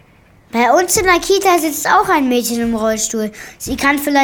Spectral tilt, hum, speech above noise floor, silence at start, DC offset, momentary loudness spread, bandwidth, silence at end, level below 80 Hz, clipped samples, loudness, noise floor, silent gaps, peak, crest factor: -2.5 dB/octave; none; 33 dB; 0.55 s; under 0.1%; 10 LU; over 20 kHz; 0 s; -40 dBFS; under 0.1%; -14 LUFS; -48 dBFS; none; -2 dBFS; 14 dB